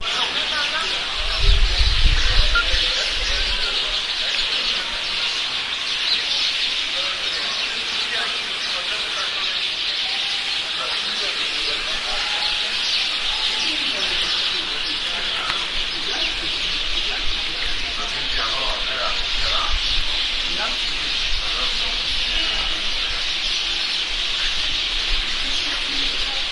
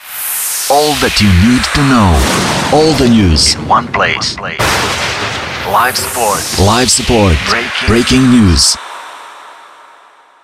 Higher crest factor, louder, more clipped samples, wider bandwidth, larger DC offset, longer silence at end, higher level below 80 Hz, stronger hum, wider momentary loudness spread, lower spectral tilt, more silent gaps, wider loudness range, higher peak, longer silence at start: first, 20 dB vs 10 dB; second, -20 LUFS vs -10 LUFS; neither; second, 11.5 kHz vs 16 kHz; neither; second, 0 s vs 0.85 s; about the same, -28 dBFS vs -24 dBFS; neither; second, 3 LU vs 8 LU; second, -1 dB/octave vs -4 dB/octave; neither; about the same, 2 LU vs 3 LU; about the same, -2 dBFS vs 0 dBFS; about the same, 0 s vs 0.05 s